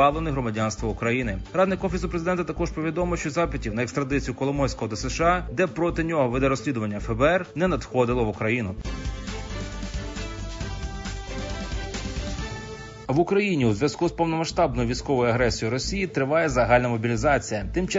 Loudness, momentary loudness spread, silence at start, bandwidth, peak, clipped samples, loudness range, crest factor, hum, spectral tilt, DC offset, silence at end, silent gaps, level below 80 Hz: -25 LUFS; 12 LU; 0 s; 7.8 kHz; -6 dBFS; under 0.1%; 10 LU; 18 dB; none; -5.5 dB/octave; under 0.1%; 0 s; none; -36 dBFS